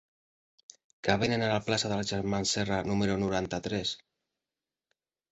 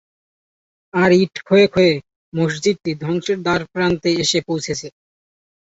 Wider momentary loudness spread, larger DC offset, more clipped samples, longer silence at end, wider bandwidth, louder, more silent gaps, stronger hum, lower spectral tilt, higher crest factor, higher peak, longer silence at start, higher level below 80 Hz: second, 6 LU vs 11 LU; neither; neither; first, 1.35 s vs 0.8 s; about the same, 8.2 kHz vs 8 kHz; second, -30 LUFS vs -18 LUFS; second, none vs 2.16-2.32 s; neither; about the same, -4.5 dB/octave vs -5 dB/octave; first, 24 dB vs 18 dB; second, -8 dBFS vs -2 dBFS; about the same, 1.05 s vs 0.95 s; about the same, -56 dBFS vs -52 dBFS